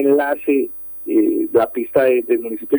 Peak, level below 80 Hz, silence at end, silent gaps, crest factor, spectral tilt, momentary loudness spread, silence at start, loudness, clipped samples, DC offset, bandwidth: -2 dBFS; -58 dBFS; 0 s; none; 14 dB; -8.5 dB/octave; 5 LU; 0 s; -17 LUFS; under 0.1%; under 0.1%; over 20 kHz